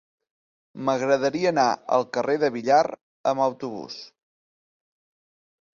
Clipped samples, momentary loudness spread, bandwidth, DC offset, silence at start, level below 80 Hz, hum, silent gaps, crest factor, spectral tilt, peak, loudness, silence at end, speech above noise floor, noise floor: under 0.1%; 13 LU; 7.4 kHz; under 0.1%; 0.75 s; -70 dBFS; none; 3.01-3.24 s; 20 dB; -5 dB/octave; -6 dBFS; -23 LUFS; 1.7 s; over 67 dB; under -90 dBFS